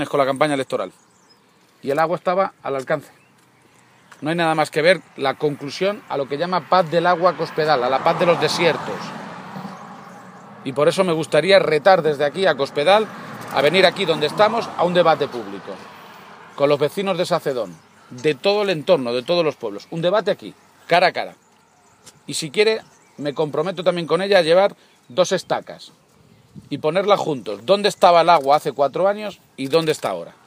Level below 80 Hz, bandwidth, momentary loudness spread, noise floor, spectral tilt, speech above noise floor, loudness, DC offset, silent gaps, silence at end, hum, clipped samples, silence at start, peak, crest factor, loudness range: -70 dBFS; 15.5 kHz; 17 LU; -55 dBFS; -4.5 dB/octave; 36 dB; -19 LUFS; under 0.1%; none; 0.15 s; none; under 0.1%; 0 s; 0 dBFS; 20 dB; 5 LU